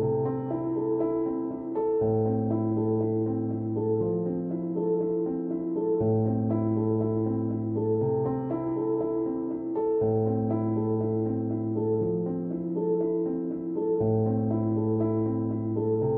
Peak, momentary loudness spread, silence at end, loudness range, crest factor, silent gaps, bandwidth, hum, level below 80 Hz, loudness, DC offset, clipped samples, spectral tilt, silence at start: -14 dBFS; 5 LU; 0 s; 1 LU; 12 dB; none; 2.5 kHz; none; -58 dBFS; -28 LUFS; under 0.1%; under 0.1%; -14.5 dB/octave; 0 s